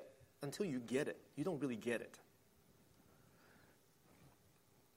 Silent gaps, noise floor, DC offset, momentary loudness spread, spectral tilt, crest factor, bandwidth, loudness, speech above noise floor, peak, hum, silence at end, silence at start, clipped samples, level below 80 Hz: none; -72 dBFS; under 0.1%; 15 LU; -5.5 dB/octave; 22 dB; 16 kHz; -44 LUFS; 29 dB; -26 dBFS; none; 0.7 s; 0 s; under 0.1%; -82 dBFS